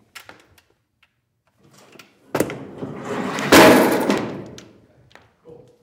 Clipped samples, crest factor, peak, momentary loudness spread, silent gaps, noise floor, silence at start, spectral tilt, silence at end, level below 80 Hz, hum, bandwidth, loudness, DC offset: under 0.1%; 20 dB; 0 dBFS; 23 LU; none; -68 dBFS; 2.35 s; -4 dB/octave; 1.3 s; -54 dBFS; none; 18 kHz; -16 LUFS; under 0.1%